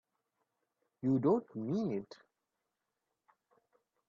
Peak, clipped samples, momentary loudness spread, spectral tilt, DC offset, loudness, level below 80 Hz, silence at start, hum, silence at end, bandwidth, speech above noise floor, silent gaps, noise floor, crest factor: -20 dBFS; under 0.1%; 11 LU; -9.5 dB/octave; under 0.1%; -35 LUFS; -80 dBFS; 1.05 s; none; 1.95 s; 7.2 kHz; 54 dB; none; -87 dBFS; 20 dB